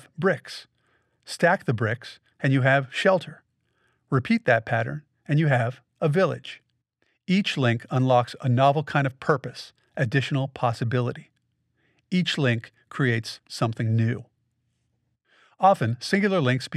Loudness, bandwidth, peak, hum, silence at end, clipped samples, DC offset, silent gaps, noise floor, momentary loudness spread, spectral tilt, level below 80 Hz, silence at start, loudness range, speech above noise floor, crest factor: -24 LUFS; 12.5 kHz; -6 dBFS; none; 0 s; under 0.1%; under 0.1%; none; -73 dBFS; 16 LU; -6.5 dB/octave; -68 dBFS; 0.2 s; 3 LU; 50 dB; 18 dB